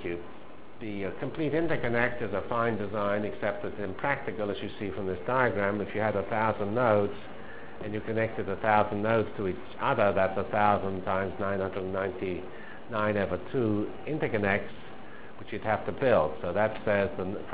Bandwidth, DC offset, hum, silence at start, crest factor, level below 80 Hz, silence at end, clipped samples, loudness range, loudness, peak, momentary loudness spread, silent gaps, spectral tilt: 4 kHz; 1%; none; 0 s; 22 dB; -54 dBFS; 0 s; under 0.1%; 4 LU; -29 LUFS; -8 dBFS; 14 LU; none; -5 dB/octave